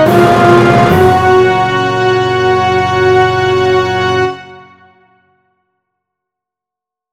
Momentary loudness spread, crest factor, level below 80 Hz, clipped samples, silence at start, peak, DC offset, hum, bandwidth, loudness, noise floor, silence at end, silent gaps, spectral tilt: 5 LU; 10 dB; -40 dBFS; 0.7%; 0 s; 0 dBFS; under 0.1%; none; 15.5 kHz; -9 LUFS; -84 dBFS; 2.55 s; none; -6 dB/octave